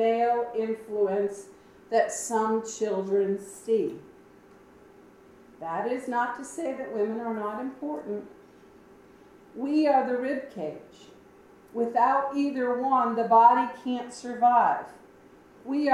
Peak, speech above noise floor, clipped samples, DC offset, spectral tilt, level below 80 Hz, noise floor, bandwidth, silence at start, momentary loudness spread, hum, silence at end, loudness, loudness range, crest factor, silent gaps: -6 dBFS; 28 dB; under 0.1%; under 0.1%; -5 dB/octave; -72 dBFS; -54 dBFS; 15 kHz; 0 s; 15 LU; none; 0 s; -27 LUFS; 9 LU; 22 dB; none